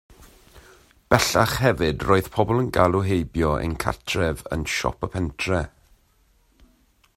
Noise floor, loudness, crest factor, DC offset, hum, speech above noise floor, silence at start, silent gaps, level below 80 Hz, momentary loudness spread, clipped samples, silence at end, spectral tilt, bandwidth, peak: -61 dBFS; -22 LUFS; 24 dB; under 0.1%; none; 39 dB; 0.55 s; none; -40 dBFS; 8 LU; under 0.1%; 1.5 s; -5 dB/octave; 16 kHz; 0 dBFS